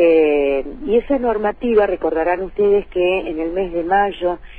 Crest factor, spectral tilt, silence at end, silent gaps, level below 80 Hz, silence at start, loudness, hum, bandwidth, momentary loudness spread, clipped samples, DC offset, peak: 14 dB; -8 dB/octave; 0 s; none; -38 dBFS; 0 s; -18 LUFS; none; 4.6 kHz; 6 LU; under 0.1%; under 0.1%; -2 dBFS